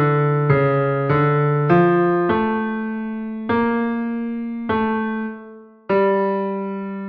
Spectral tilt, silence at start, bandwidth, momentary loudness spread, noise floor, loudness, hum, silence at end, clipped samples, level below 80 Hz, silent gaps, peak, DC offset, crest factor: -10.5 dB/octave; 0 s; 4.9 kHz; 11 LU; -41 dBFS; -19 LUFS; none; 0 s; under 0.1%; -52 dBFS; none; -4 dBFS; under 0.1%; 16 dB